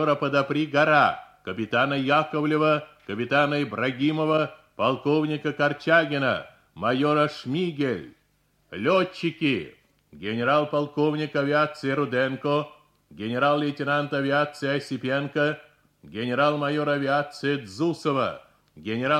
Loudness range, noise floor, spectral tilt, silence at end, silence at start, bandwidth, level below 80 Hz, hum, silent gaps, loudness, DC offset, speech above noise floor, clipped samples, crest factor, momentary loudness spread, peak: 3 LU; -67 dBFS; -6.5 dB/octave; 0 s; 0 s; 11.5 kHz; -66 dBFS; none; none; -24 LUFS; under 0.1%; 43 dB; under 0.1%; 18 dB; 10 LU; -6 dBFS